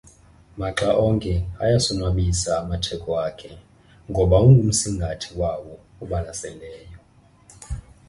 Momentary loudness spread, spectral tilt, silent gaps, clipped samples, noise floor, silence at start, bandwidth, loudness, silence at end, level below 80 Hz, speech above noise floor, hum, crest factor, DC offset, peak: 20 LU; -5.5 dB/octave; none; under 0.1%; -54 dBFS; 0.55 s; 11.5 kHz; -21 LUFS; 0.3 s; -34 dBFS; 33 dB; none; 20 dB; under 0.1%; -4 dBFS